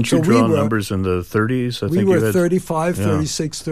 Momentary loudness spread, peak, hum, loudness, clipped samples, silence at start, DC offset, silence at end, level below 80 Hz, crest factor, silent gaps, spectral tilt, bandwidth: 6 LU; -2 dBFS; none; -18 LUFS; under 0.1%; 0 s; 0.6%; 0 s; -46 dBFS; 14 dB; none; -6 dB/octave; 15.5 kHz